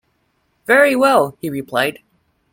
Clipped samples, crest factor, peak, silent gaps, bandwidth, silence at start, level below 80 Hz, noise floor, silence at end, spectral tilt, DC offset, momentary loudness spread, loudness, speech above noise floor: under 0.1%; 16 dB; 0 dBFS; none; 16.5 kHz; 0.7 s; -60 dBFS; -65 dBFS; 0.6 s; -4.5 dB/octave; under 0.1%; 12 LU; -15 LUFS; 50 dB